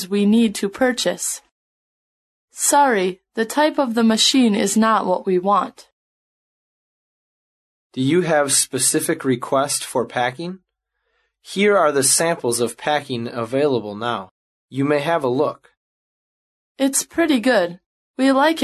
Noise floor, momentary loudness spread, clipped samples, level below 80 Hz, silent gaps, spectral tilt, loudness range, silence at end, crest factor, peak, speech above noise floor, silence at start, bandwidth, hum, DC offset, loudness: -74 dBFS; 10 LU; under 0.1%; -64 dBFS; 1.51-2.48 s, 5.92-7.90 s, 14.31-14.68 s, 15.77-16.75 s, 17.86-18.14 s; -3.5 dB/octave; 6 LU; 0 s; 16 dB; -4 dBFS; 56 dB; 0 s; 13 kHz; none; under 0.1%; -18 LUFS